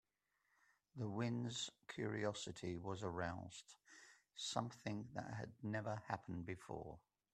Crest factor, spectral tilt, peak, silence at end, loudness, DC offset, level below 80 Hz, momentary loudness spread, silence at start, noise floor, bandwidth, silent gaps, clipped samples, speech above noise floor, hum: 24 dB; -5 dB/octave; -24 dBFS; 0.35 s; -47 LUFS; under 0.1%; -76 dBFS; 15 LU; 0.95 s; -86 dBFS; 12.5 kHz; none; under 0.1%; 39 dB; none